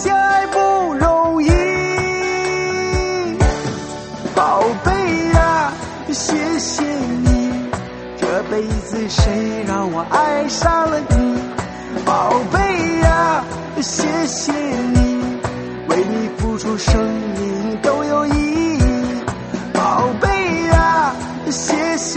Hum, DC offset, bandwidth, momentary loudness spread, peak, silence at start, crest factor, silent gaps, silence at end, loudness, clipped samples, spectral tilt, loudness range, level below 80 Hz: none; under 0.1%; 8.8 kHz; 9 LU; 0 dBFS; 0 s; 16 dB; none; 0 s; -17 LUFS; under 0.1%; -5 dB/octave; 3 LU; -26 dBFS